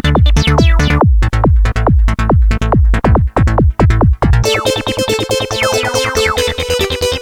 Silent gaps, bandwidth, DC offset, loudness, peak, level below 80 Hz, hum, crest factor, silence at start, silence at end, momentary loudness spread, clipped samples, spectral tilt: none; 16 kHz; under 0.1%; -12 LUFS; 0 dBFS; -14 dBFS; none; 10 dB; 0.05 s; 0 s; 4 LU; under 0.1%; -5.5 dB/octave